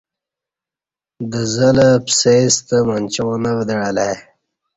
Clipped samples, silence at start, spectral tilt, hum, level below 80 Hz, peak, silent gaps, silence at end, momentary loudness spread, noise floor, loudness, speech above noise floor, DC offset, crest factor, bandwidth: under 0.1%; 1.2 s; -4.5 dB/octave; none; -50 dBFS; -2 dBFS; none; 0.55 s; 10 LU; -89 dBFS; -15 LUFS; 75 dB; under 0.1%; 16 dB; 8.2 kHz